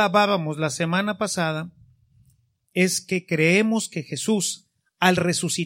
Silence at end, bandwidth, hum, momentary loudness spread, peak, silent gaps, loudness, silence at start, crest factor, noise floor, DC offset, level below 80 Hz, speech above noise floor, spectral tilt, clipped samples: 0 s; 16.5 kHz; none; 10 LU; -2 dBFS; none; -22 LUFS; 0 s; 22 dB; -63 dBFS; under 0.1%; -64 dBFS; 41 dB; -4 dB/octave; under 0.1%